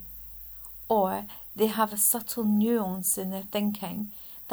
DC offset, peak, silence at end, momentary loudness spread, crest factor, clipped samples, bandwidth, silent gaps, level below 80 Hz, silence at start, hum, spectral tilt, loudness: under 0.1%; -12 dBFS; 0 s; 14 LU; 18 dB; under 0.1%; over 20 kHz; none; -58 dBFS; 0 s; none; -4 dB/octave; -28 LUFS